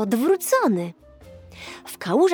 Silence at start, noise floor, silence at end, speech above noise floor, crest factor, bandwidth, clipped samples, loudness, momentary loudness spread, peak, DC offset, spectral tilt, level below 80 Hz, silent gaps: 0 s; -45 dBFS; 0 s; 24 dB; 14 dB; over 20 kHz; under 0.1%; -21 LUFS; 19 LU; -8 dBFS; under 0.1%; -5 dB/octave; -58 dBFS; none